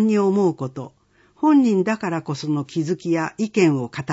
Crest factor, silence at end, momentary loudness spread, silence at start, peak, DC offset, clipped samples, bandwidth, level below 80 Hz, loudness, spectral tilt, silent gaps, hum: 16 dB; 0 s; 12 LU; 0 s; -6 dBFS; under 0.1%; under 0.1%; 8 kHz; -66 dBFS; -21 LUFS; -7 dB/octave; none; none